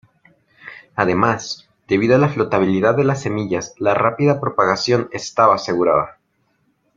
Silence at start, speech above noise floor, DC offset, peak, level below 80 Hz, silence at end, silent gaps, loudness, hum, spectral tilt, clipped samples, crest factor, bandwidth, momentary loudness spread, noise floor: 0.65 s; 48 dB; under 0.1%; -2 dBFS; -56 dBFS; 0.85 s; none; -17 LUFS; none; -6 dB/octave; under 0.1%; 18 dB; 7.6 kHz; 11 LU; -65 dBFS